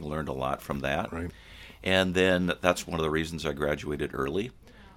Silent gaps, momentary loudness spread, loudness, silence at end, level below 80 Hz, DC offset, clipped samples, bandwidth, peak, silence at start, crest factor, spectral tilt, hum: none; 13 LU; -29 LUFS; 0.05 s; -48 dBFS; under 0.1%; under 0.1%; 17 kHz; -6 dBFS; 0 s; 24 dB; -5 dB/octave; none